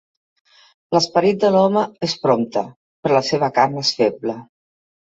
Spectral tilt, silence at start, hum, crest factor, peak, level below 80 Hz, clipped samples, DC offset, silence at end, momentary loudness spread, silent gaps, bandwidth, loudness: -5 dB/octave; 0.9 s; none; 18 dB; -2 dBFS; -62 dBFS; under 0.1%; under 0.1%; 0.65 s; 11 LU; 2.76-3.03 s; 8 kHz; -18 LUFS